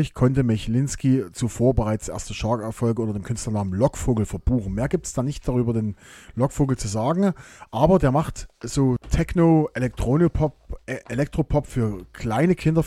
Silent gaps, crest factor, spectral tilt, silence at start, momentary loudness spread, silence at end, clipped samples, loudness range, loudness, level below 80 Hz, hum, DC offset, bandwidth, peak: none; 16 dB; -7 dB/octave; 0 s; 10 LU; 0 s; under 0.1%; 3 LU; -23 LUFS; -36 dBFS; none; under 0.1%; 13.5 kHz; -6 dBFS